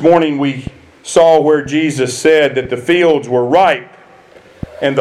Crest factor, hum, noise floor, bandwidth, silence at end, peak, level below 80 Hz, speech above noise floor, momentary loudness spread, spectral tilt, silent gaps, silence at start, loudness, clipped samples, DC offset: 12 dB; none; -42 dBFS; 12.5 kHz; 0 s; 0 dBFS; -46 dBFS; 30 dB; 16 LU; -5 dB/octave; none; 0 s; -12 LUFS; under 0.1%; under 0.1%